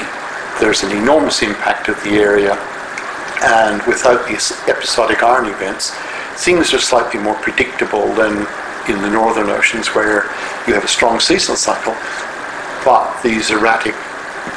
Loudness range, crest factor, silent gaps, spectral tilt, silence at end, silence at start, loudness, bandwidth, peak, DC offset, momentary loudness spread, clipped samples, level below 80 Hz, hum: 1 LU; 14 dB; none; -2.5 dB/octave; 0 s; 0 s; -14 LUFS; 11 kHz; 0 dBFS; under 0.1%; 11 LU; under 0.1%; -44 dBFS; none